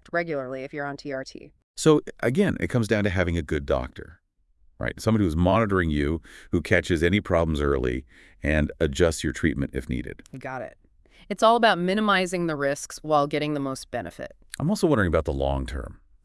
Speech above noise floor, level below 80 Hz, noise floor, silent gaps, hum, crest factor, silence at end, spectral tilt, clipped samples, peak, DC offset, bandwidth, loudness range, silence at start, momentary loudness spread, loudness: 36 dB; -40 dBFS; -60 dBFS; 1.63-1.74 s; none; 20 dB; 0.3 s; -6 dB/octave; under 0.1%; -4 dBFS; under 0.1%; 12 kHz; 3 LU; 0.15 s; 14 LU; -25 LUFS